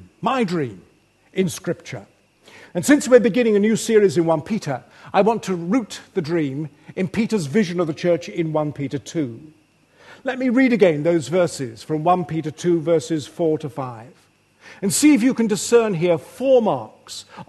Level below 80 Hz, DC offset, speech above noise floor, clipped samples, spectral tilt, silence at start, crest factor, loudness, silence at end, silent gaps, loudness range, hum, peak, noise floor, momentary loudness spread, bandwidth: -62 dBFS; under 0.1%; 34 dB; under 0.1%; -5.5 dB/octave; 0 s; 20 dB; -20 LUFS; 0.05 s; none; 5 LU; none; 0 dBFS; -54 dBFS; 15 LU; 12.5 kHz